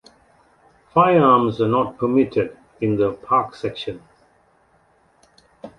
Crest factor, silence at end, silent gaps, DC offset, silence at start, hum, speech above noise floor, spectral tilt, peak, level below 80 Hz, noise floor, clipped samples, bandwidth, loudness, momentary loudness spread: 18 dB; 0.1 s; none; under 0.1%; 0.95 s; none; 40 dB; -8.5 dB/octave; -2 dBFS; -56 dBFS; -59 dBFS; under 0.1%; 11 kHz; -19 LUFS; 14 LU